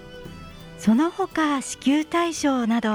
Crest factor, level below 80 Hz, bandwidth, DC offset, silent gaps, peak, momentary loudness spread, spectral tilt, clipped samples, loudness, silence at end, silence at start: 14 dB; -52 dBFS; 14.5 kHz; under 0.1%; none; -10 dBFS; 20 LU; -4.5 dB/octave; under 0.1%; -23 LUFS; 0 s; 0 s